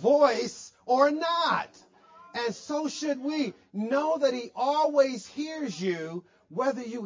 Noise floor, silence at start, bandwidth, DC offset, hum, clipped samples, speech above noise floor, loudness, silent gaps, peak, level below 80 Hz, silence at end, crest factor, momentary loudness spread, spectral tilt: -54 dBFS; 0 s; 7.6 kHz; under 0.1%; none; under 0.1%; 27 dB; -28 LUFS; none; -8 dBFS; -76 dBFS; 0 s; 20 dB; 12 LU; -4.5 dB/octave